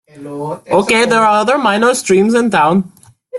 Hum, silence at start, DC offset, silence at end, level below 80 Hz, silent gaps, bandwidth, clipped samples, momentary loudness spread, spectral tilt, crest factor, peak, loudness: none; 0.15 s; under 0.1%; 0 s; -54 dBFS; none; 12.5 kHz; under 0.1%; 14 LU; -4.5 dB/octave; 12 dB; 0 dBFS; -12 LUFS